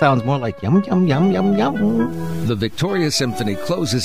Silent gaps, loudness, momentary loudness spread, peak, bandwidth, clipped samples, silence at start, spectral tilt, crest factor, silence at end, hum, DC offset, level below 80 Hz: none; -18 LUFS; 6 LU; -2 dBFS; 15.5 kHz; under 0.1%; 0 s; -6 dB/octave; 16 dB; 0 s; none; 2%; -48 dBFS